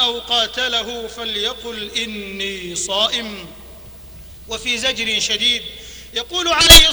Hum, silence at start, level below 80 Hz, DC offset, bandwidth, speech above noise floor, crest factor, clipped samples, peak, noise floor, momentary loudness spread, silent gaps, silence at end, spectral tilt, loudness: none; 0 s; -30 dBFS; under 0.1%; over 20 kHz; 21 dB; 18 dB; 0.4%; 0 dBFS; -37 dBFS; 19 LU; none; 0 s; -1 dB/octave; -16 LUFS